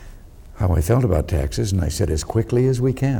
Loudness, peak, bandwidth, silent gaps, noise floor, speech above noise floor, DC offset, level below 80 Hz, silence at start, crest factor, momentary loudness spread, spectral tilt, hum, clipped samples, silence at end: -20 LUFS; -6 dBFS; 18.5 kHz; none; -40 dBFS; 21 dB; under 0.1%; -30 dBFS; 0 s; 14 dB; 4 LU; -7 dB/octave; none; under 0.1%; 0 s